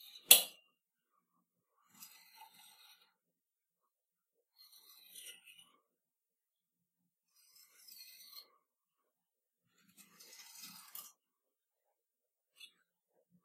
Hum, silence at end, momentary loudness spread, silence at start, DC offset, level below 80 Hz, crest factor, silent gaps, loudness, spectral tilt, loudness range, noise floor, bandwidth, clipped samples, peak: none; 13 s; 31 LU; 0.3 s; under 0.1%; under -90 dBFS; 40 dB; none; -26 LUFS; 3 dB/octave; 7 LU; under -90 dBFS; 16 kHz; under 0.1%; -4 dBFS